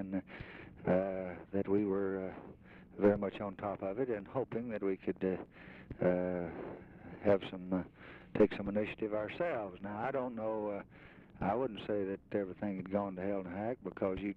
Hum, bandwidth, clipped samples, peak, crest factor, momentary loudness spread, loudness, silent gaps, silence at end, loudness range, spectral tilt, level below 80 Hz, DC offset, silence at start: none; 5.4 kHz; under 0.1%; -18 dBFS; 20 dB; 17 LU; -37 LUFS; none; 0 s; 3 LU; -9.5 dB/octave; -62 dBFS; under 0.1%; 0 s